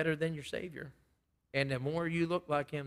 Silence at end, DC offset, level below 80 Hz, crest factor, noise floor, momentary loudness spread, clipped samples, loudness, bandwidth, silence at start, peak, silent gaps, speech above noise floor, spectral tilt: 0 s; under 0.1%; -68 dBFS; 20 dB; -76 dBFS; 12 LU; under 0.1%; -36 LUFS; 14.5 kHz; 0 s; -16 dBFS; none; 41 dB; -6.5 dB/octave